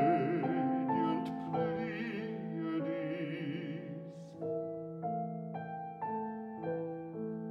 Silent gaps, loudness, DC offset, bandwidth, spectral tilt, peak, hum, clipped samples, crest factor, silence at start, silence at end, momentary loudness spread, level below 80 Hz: none; -37 LUFS; under 0.1%; 6.8 kHz; -9 dB/octave; -18 dBFS; none; under 0.1%; 18 dB; 0 s; 0 s; 9 LU; -76 dBFS